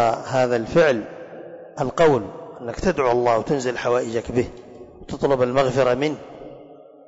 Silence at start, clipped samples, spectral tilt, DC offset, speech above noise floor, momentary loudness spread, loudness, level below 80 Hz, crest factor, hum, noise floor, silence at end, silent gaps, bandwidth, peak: 0 s; under 0.1%; -6 dB/octave; under 0.1%; 25 dB; 20 LU; -21 LUFS; -46 dBFS; 14 dB; none; -45 dBFS; 0.3 s; none; 8 kHz; -8 dBFS